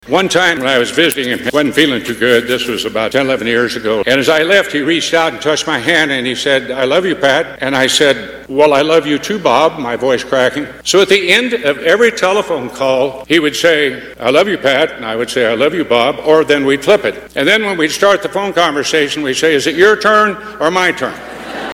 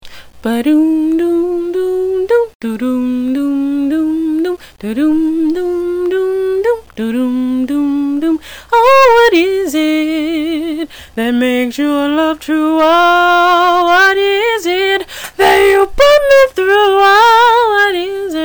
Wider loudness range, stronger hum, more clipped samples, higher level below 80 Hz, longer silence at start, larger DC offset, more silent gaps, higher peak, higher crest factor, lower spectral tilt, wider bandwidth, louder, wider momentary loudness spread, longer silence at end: second, 1 LU vs 6 LU; neither; first, 0.3% vs under 0.1%; second, -48 dBFS vs -40 dBFS; about the same, 0.05 s vs 0.05 s; neither; second, none vs 2.55-2.60 s; about the same, 0 dBFS vs -2 dBFS; about the same, 12 dB vs 10 dB; about the same, -3 dB/octave vs -3.5 dB/octave; about the same, 18.5 kHz vs over 20 kHz; about the same, -12 LUFS vs -12 LUFS; second, 6 LU vs 10 LU; about the same, 0 s vs 0 s